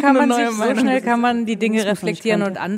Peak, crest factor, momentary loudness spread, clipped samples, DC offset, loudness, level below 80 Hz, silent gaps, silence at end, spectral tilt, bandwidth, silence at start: 0 dBFS; 16 dB; 5 LU; under 0.1%; under 0.1%; -18 LUFS; -64 dBFS; none; 0 s; -5 dB/octave; 15.5 kHz; 0 s